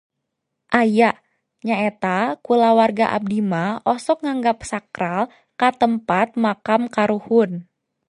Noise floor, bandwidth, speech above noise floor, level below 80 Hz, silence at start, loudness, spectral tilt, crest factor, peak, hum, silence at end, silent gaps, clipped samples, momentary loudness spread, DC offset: -78 dBFS; 11 kHz; 59 dB; -58 dBFS; 0.7 s; -19 LUFS; -6 dB/octave; 20 dB; 0 dBFS; none; 0.45 s; none; under 0.1%; 9 LU; under 0.1%